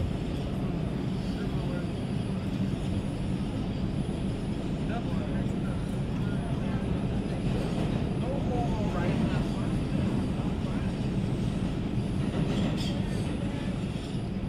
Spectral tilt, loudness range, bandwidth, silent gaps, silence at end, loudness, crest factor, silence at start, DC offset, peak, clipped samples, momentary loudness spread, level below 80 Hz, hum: -7.5 dB/octave; 2 LU; 12.5 kHz; none; 0 s; -31 LUFS; 14 dB; 0 s; under 0.1%; -16 dBFS; under 0.1%; 3 LU; -40 dBFS; none